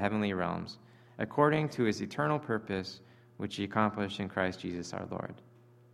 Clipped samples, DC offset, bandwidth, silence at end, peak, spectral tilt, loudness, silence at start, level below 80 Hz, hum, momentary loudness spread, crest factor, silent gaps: under 0.1%; under 0.1%; 12.5 kHz; 0.5 s; -10 dBFS; -6.5 dB/octave; -33 LUFS; 0 s; -68 dBFS; none; 14 LU; 24 dB; none